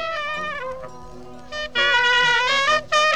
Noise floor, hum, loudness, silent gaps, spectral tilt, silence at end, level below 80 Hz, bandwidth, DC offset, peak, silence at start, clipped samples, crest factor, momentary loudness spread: -40 dBFS; none; -18 LUFS; none; -1 dB/octave; 0 s; -50 dBFS; 13 kHz; 1%; -4 dBFS; 0 s; under 0.1%; 16 dB; 17 LU